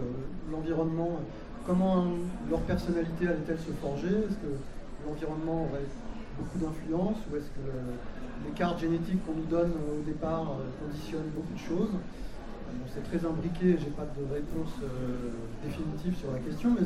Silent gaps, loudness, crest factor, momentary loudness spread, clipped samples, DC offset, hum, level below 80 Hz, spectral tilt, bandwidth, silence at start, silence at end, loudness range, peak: none; -33 LUFS; 18 dB; 11 LU; under 0.1%; under 0.1%; none; -42 dBFS; -8 dB/octave; 13 kHz; 0 s; 0 s; 4 LU; -14 dBFS